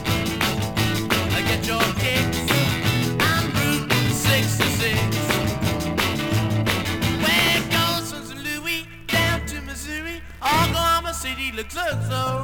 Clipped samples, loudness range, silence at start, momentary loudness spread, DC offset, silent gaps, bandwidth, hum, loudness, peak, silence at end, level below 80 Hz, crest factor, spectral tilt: under 0.1%; 3 LU; 0 s; 8 LU; under 0.1%; none; 19.5 kHz; none; -21 LUFS; -4 dBFS; 0 s; -40 dBFS; 18 dB; -4 dB/octave